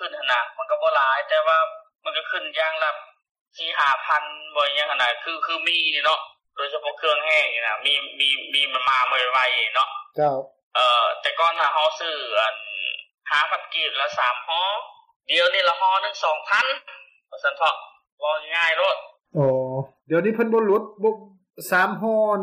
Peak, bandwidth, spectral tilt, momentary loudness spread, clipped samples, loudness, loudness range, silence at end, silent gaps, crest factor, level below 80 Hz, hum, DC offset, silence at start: -8 dBFS; 15 kHz; -3.5 dB/octave; 9 LU; under 0.1%; -21 LUFS; 3 LU; 0 s; 3.31-3.35 s, 3.41-3.46 s, 10.63-10.71 s, 15.16-15.20 s, 18.12-18.18 s; 16 dB; -76 dBFS; none; under 0.1%; 0 s